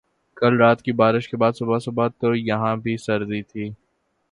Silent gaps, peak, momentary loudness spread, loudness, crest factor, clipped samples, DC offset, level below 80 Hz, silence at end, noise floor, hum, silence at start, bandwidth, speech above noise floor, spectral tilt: none; -2 dBFS; 12 LU; -21 LUFS; 20 dB; under 0.1%; under 0.1%; -60 dBFS; 0.55 s; -70 dBFS; none; 0.35 s; 11 kHz; 49 dB; -7.5 dB/octave